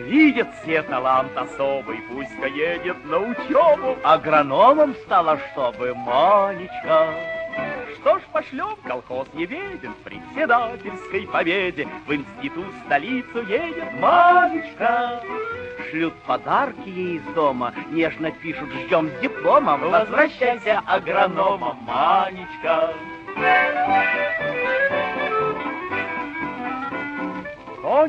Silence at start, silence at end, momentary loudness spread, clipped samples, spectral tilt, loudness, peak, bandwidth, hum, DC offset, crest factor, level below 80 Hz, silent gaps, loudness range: 0 s; 0 s; 13 LU; under 0.1%; -6.5 dB/octave; -21 LUFS; -2 dBFS; 8.2 kHz; none; under 0.1%; 20 dB; -56 dBFS; none; 6 LU